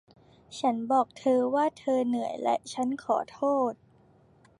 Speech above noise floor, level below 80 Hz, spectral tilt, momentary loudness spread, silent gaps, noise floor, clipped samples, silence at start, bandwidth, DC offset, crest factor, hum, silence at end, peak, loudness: 33 dB; -72 dBFS; -5 dB/octave; 6 LU; none; -60 dBFS; under 0.1%; 0.5 s; 11.5 kHz; under 0.1%; 16 dB; none; 0.85 s; -12 dBFS; -28 LUFS